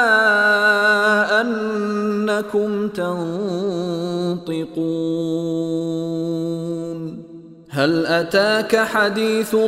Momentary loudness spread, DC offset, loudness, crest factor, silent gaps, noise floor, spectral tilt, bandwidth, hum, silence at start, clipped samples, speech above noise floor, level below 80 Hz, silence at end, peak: 11 LU; under 0.1%; -19 LUFS; 16 dB; none; -40 dBFS; -5 dB/octave; 16 kHz; none; 0 s; under 0.1%; 20 dB; -62 dBFS; 0 s; -2 dBFS